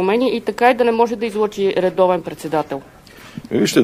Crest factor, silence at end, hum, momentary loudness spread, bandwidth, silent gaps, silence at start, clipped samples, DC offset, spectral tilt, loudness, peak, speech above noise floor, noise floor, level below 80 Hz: 18 dB; 0 s; none; 12 LU; 16 kHz; none; 0 s; under 0.1%; under 0.1%; -5 dB/octave; -18 LUFS; 0 dBFS; 19 dB; -36 dBFS; -54 dBFS